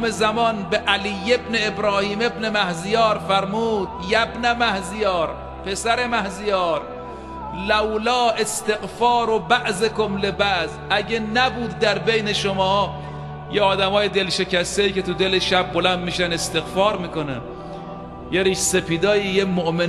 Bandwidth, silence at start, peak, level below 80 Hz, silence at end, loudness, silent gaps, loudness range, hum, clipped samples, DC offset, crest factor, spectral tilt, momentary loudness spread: 13 kHz; 0 s; -2 dBFS; -44 dBFS; 0 s; -20 LUFS; none; 2 LU; none; under 0.1%; under 0.1%; 18 dB; -3.5 dB/octave; 9 LU